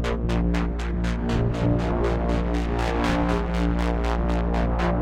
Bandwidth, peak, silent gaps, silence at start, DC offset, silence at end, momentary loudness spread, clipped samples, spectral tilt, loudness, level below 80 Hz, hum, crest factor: 9.2 kHz; -8 dBFS; none; 0 s; under 0.1%; 0 s; 3 LU; under 0.1%; -7.5 dB/octave; -24 LUFS; -26 dBFS; none; 14 dB